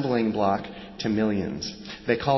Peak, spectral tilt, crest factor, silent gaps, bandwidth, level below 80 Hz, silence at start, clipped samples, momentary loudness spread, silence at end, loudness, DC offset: -8 dBFS; -6 dB/octave; 18 dB; none; 6.2 kHz; -52 dBFS; 0 s; under 0.1%; 10 LU; 0 s; -27 LUFS; under 0.1%